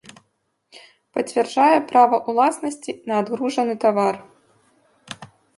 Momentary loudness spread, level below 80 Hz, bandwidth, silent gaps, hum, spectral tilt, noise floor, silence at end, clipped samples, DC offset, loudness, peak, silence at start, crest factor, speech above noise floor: 19 LU; -72 dBFS; 11.5 kHz; none; none; -4.5 dB/octave; -70 dBFS; 0.3 s; under 0.1%; under 0.1%; -20 LUFS; -4 dBFS; 0.75 s; 18 dB; 51 dB